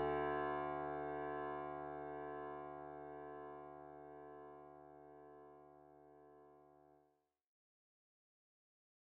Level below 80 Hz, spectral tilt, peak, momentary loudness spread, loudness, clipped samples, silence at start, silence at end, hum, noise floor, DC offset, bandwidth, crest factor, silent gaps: -72 dBFS; -5 dB/octave; -30 dBFS; 23 LU; -47 LUFS; under 0.1%; 0 s; 2.2 s; none; -80 dBFS; under 0.1%; 4.5 kHz; 18 dB; none